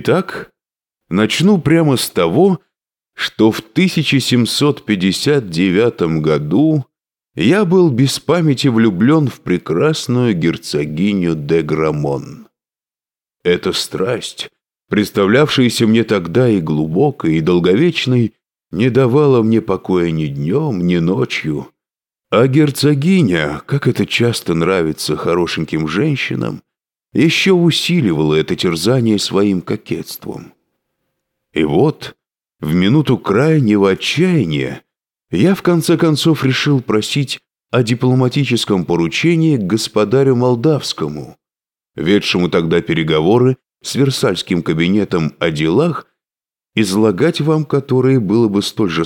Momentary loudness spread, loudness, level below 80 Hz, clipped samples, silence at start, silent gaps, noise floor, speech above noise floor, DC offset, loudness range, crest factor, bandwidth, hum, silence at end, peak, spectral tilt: 10 LU; -14 LUFS; -48 dBFS; under 0.1%; 0 s; none; under -90 dBFS; over 76 dB; under 0.1%; 4 LU; 14 dB; 17.5 kHz; none; 0 s; -2 dBFS; -6 dB/octave